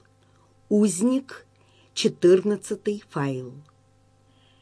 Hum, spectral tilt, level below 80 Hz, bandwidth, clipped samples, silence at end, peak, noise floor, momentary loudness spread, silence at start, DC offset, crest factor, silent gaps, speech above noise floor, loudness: none; -5.5 dB/octave; -70 dBFS; 11 kHz; under 0.1%; 1 s; -8 dBFS; -60 dBFS; 17 LU; 0.7 s; under 0.1%; 18 dB; none; 37 dB; -24 LUFS